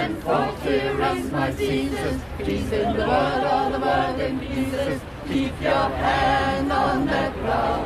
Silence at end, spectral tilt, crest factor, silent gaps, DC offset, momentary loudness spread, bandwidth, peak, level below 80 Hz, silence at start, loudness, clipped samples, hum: 0 s; -6 dB/octave; 16 dB; none; under 0.1%; 6 LU; 14.5 kHz; -8 dBFS; -38 dBFS; 0 s; -23 LUFS; under 0.1%; none